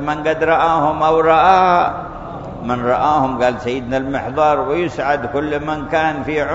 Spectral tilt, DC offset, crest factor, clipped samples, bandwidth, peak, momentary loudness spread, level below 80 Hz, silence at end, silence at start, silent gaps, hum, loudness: -6.5 dB/octave; under 0.1%; 16 dB; under 0.1%; 7.8 kHz; 0 dBFS; 11 LU; -40 dBFS; 0 s; 0 s; none; none; -16 LUFS